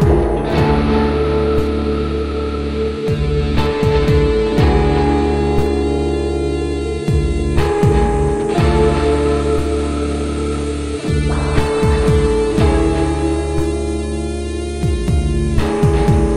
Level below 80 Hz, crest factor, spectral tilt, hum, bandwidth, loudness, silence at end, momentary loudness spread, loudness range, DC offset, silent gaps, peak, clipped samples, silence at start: -20 dBFS; 14 dB; -7 dB/octave; none; 11 kHz; -16 LUFS; 0 s; 6 LU; 2 LU; 0.5%; none; 0 dBFS; under 0.1%; 0 s